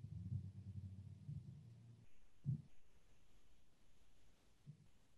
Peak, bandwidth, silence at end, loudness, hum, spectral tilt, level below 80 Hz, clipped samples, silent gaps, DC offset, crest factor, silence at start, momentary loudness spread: -34 dBFS; 11.5 kHz; 0.05 s; -53 LUFS; none; -8.5 dB/octave; -74 dBFS; under 0.1%; none; under 0.1%; 20 dB; 0 s; 19 LU